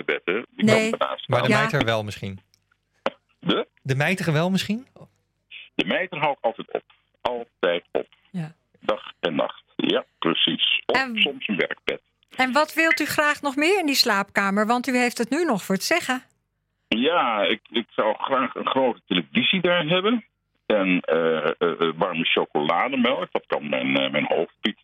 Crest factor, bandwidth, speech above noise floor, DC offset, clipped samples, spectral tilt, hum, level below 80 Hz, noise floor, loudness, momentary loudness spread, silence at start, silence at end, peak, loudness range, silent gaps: 20 dB; 16.5 kHz; 52 dB; under 0.1%; under 0.1%; -4.5 dB/octave; none; -64 dBFS; -74 dBFS; -23 LUFS; 12 LU; 0 s; 0.1 s; -4 dBFS; 6 LU; none